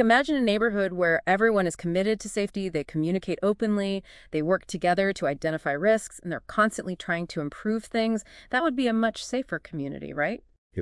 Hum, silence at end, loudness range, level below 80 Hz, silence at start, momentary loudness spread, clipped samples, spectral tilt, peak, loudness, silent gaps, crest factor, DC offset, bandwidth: none; 0 s; 3 LU; -56 dBFS; 0 s; 10 LU; under 0.1%; -5.5 dB/octave; -6 dBFS; -26 LUFS; 10.58-10.70 s; 20 dB; under 0.1%; 12 kHz